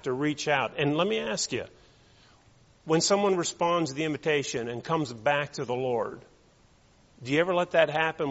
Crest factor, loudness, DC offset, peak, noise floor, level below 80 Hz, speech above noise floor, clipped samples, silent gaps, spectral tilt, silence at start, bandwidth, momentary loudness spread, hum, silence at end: 22 dB; -27 LUFS; under 0.1%; -8 dBFS; -60 dBFS; -64 dBFS; 33 dB; under 0.1%; none; -3.5 dB/octave; 0.05 s; 8 kHz; 9 LU; none; 0 s